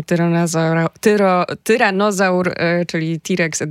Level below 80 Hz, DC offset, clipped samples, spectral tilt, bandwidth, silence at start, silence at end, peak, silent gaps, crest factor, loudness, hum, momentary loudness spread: -62 dBFS; under 0.1%; under 0.1%; -5.5 dB/octave; 15.5 kHz; 0 s; 0 s; 0 dBFS; none; 16 dB; -16 LUFS; none; 4 LU